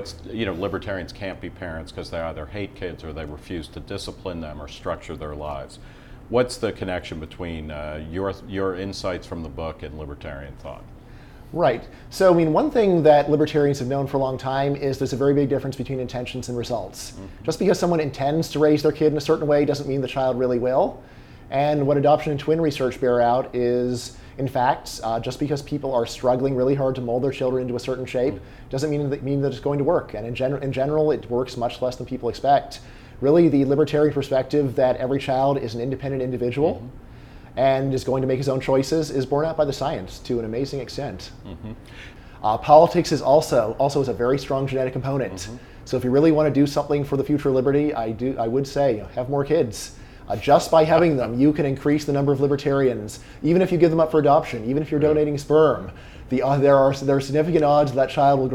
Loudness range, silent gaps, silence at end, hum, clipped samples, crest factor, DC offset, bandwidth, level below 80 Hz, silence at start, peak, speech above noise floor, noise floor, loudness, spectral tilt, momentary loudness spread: 10 LU; none; 0 s; none; under 0.1%; 20 dB; under 0.1%; 16 kHz; -44 dBFS; 0 s; 0 dBFS; 21 dB; -43 dBFS; -22 LUFS; -6.5 dB/octave; 16 LU